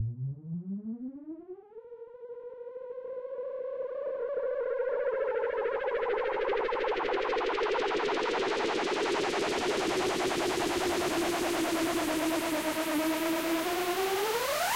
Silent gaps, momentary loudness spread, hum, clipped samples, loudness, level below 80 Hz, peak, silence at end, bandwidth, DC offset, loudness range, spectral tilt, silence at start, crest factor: none; 13 LU; none; under 0.1%; -31 LUFS; -60 dBFS; -20 dBFS; 0 s; 16 kHz; under 0.1%; 11 LU; -4 dB/octave; 0 s; 10 dB